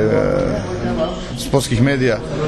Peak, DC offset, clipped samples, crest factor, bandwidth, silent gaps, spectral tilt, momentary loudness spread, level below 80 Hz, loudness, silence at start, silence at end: -2 dBFS; under 0.1%; under 0.1%; 16 dB; 13 kHz; none; -6 dB/octave; 6 LU; -32 dBFS; -18 LUFS; 0 s; 0 s